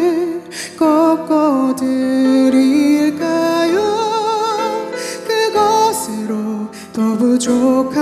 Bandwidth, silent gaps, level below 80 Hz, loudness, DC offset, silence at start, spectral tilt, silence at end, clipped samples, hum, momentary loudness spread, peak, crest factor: 14 kHz; none; -60 dBFS; -15 LUFS; under 0.1%; 0 s; -4.5 dB/octave; 0 s; under 0.1%; none; 10 LU; -4 dBFS; 12 dB